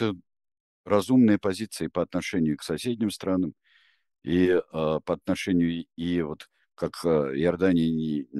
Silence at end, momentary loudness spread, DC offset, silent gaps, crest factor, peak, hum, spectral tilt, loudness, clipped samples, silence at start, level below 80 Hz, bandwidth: 0 s; 10 LU; under 0.1%; 0.60-0.84 s; 18 dB; -8 dBFS; none; -6.5 dB/octave; -26 LUFS; under 0.1%; 0 s; -56 dBFS; 12.5 kHz